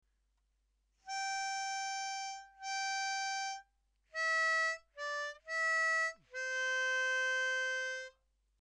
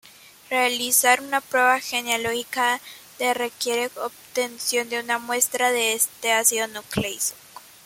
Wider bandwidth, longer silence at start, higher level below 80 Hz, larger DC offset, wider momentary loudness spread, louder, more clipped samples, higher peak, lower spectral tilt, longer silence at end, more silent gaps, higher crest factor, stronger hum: second, 12.5 kHz vs 17 kHz; first, 1.05 s vs 0.5 s; second, -78 dBFS vs -60 dBFS; neither; about the same, 11 LU vs 9 LU; second, -35 LUFS vs -22 LUFS; neither; second, -26 dBFS vs -2 dBFS; second, 3.5 dB/octave vs -1 dB/octave; first, 0.5 s vs 0.25 s; neither; second, 12 dB vs 22 dB; neither